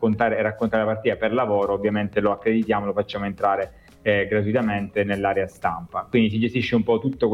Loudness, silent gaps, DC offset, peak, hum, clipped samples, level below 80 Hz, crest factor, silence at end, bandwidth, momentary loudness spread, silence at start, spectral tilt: -23 LUFS; none; under 0.1%; -8 dBFS; none; under 0.1%; -50 dBFS; 14 dB; 0 s; 11 kHz; 5 LU; 0 s; -8 dB/octave